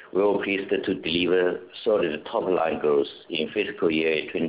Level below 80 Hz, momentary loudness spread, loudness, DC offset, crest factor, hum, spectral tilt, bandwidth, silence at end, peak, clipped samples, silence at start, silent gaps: -58 dBFS; 5 LU; -25 LUFS; under 0.1%; 14 dB; none; -9 dB/octave; 4 kHz; 0 s; -10 dBFS; under 0.1%; 0 s; none